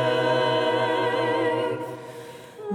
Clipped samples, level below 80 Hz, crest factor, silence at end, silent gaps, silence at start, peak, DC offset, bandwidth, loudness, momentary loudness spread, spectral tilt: under 0.1%; -74 dBFS; 14 dB; 0 s; none; 0 s; -10 dBFS; under 0.1%; 15 kHz; -23 LUFS; 17 LU; -5.5 dB/octave